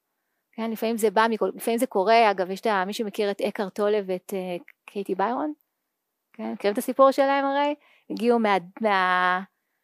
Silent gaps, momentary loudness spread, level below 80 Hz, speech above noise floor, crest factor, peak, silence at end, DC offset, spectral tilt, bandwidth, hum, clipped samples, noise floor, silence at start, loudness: none; 14 LU; -86 dBFS; 57 dB; 18 dB; -6 dBFS; 0.4 s; under 0.1%; -4.5 dB/octave; 15.5 kHz; none; under 0.1%; -80 dBFS; 0.6 s; -24 LUFS